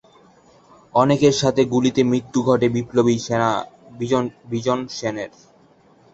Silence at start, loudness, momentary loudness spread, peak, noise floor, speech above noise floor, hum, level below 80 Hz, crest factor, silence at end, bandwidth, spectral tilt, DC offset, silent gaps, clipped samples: 0.95 s; -20 LUFS; 11 LU; -2 dBFS; -53 dBFS; 34 dB; none; -54 dBFS; 18 dB; 0.85 s; 8 kHz; -5.5 dB/octave; under 0.1%; none; under 0.1%